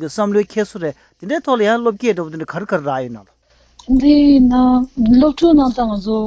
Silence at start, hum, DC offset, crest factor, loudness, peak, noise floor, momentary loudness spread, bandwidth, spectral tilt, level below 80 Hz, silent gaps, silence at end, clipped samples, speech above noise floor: 0 s; none; under 0.1%; 14 dB; -15 LUFS; -2 dBFS; -48 dBFS; 14 LU; 8 kHz; -6.5 dB/octave; -36 dBFS; none; 0 s; under 0.1%; 34 dB